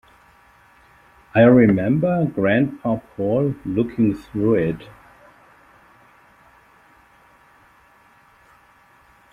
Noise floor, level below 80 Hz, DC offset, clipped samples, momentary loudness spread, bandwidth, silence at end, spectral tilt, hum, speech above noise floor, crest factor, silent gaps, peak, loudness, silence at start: -54 dBFS; -52 dBFS; under 0.1%; under 0.1%; 11 LU; 4.9 kHz; 4.45 s; -9.5 dB/octave; none; 36 dB; 20 dB; none; -2 dBFS; -19 LUFS; 1.35 s